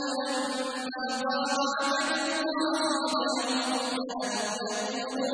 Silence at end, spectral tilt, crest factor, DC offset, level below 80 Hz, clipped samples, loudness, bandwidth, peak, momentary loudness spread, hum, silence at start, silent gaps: 0 s; -1.5 dB/octave; 14 dB; under 0.1%; -74 dBFS; under 0.1%; -29 LUFS; 10.5 kHz; -16 dBFS; 5 LU; none; 0 s; none